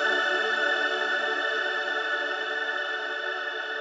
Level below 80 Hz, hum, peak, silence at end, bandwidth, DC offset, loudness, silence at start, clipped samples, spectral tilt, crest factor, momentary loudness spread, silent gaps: under -90 dBFS; none; -14 dBFS; 0 s; 9.2 kHz; under 0.1%; -26 LUFS; 0 s; under 0.1%; 0 dB/octave; 14 dB; 6 LU; none